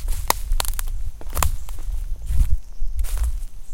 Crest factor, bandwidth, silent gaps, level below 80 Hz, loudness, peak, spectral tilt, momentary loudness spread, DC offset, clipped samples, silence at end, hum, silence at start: 20 dB; 17 kHz; none; -24 dBFS; -27 LUFS; 0 dBFS; -3 dB/octave; 10 LU; under 0.1%; under 0.1%; 0 s; none; 0 s